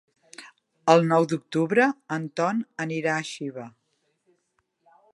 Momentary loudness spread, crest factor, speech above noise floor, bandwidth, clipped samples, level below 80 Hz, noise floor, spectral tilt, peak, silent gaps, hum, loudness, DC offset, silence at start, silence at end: 24 LU; 22 dB; 50 dB; 11.5 kHz; under 0.1%; -78 dBFS; -74 dBFS; -6 dB/octave; -4 dBFS; none; none; -24 LUFS; under 0.1%; 0.4 s; 1.45 s